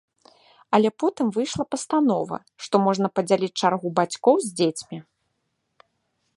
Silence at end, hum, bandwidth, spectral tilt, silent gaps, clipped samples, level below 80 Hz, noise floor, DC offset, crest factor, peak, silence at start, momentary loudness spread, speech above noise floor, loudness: 1.35 s; none; 11.5 kHz; -5 dB/octave; none; under 0.1%; -64 dBFS; -75 dBFS; under 0.1%; 20 dB; -4 dBFS; 0.7 s; 10 LU; 53 dB; -23 LUFS